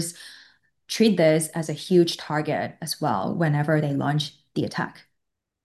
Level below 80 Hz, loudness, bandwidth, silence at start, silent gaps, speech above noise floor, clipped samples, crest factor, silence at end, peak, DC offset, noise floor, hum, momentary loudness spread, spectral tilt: -66 dBFS; -24 LUFS; 12.5 kHz; 0 s; none; 57 dB; under 0.1%; 18 dB; 0.65 s; -6 dBFS; under 0.1%; -80 dBFS; none; 11 LU; -5.5 dB/octave